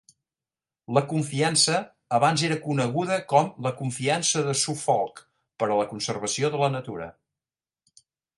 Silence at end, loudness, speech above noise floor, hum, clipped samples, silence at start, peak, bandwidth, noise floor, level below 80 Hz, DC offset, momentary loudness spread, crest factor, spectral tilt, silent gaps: 1.25 s; -25 LUFS; over 65 dB; none; under 0.1%; 0.9 s; -6 dBFS; 11.5 kHz; under -90 dBFS; -66 dBFS; under 0.1%; 8 LU; 20 dB; -4 dB/octave; none